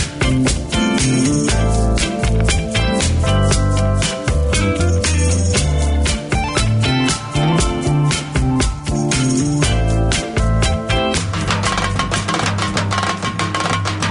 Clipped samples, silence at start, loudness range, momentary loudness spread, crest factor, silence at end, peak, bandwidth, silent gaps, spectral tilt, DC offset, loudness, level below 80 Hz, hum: under 0.1%; 0 s; 1 LU; 3 LU; 14 dB; 0 s; -2 dBFS; 11 kHz; none; -4.5 dB/octave; under 0.1%; -17 LUFS; -22 dBFS; none